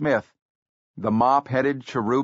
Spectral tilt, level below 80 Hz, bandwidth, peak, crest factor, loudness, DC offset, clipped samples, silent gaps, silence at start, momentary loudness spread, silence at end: -5.5 dB/octave; -60 dBFS; 7.6 kHz; -6 dBFS; 16 dB; -23 LUFS; under 0.1%; under 0.1%; 0.42-0.94 s; 0 s; 7 LU; 0 s